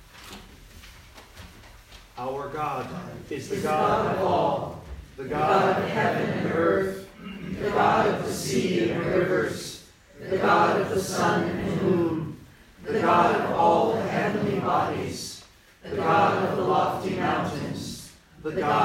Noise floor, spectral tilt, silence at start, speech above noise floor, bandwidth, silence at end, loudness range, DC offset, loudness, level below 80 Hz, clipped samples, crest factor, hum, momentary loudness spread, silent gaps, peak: -50 dBFS; -5.5 dB/octave; 0 s; 26 dB; 16 kHz; 0 s; 4 LU; under 0.1%; -25 LUFS; -54 dBFS; under 0.1%; 20 dB; none; 18 LU; none; -6 dBFS